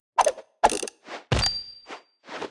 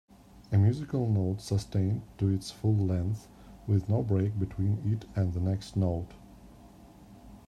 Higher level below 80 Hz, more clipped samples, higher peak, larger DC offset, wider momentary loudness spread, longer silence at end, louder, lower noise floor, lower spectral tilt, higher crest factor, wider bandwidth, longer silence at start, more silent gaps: first, -42 dBFS vs -54 dBFS; neither; first, -4 dBFS vs -14 dBFS; neither; first, 18 LU vs 5 LU; about the same, 0 s vs 0.1 s; first, -25 LUFS vs -30 LUFS; second, -45 dBFS vs -53 dBFS; second, -3 dB/octave vs -8 dB/octave; first, 24 dB vs 16 dB; about the same, 12 kHz vs 11.5 kHz; second, 0.15 s vs 0.35 s; neither